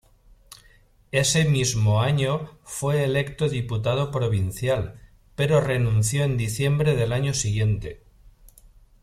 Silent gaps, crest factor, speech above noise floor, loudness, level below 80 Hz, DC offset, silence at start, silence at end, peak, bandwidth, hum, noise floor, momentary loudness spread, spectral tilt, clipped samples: none; 18 dB; 33 dB; -23 LUFS; -46 dBFS; under 0.1%; 1.15 s; 1.05 s; -6 dBFS; 14.5 kHz; none; -56 dBFS; 7 LU; -5 dB/octave; under 0.1%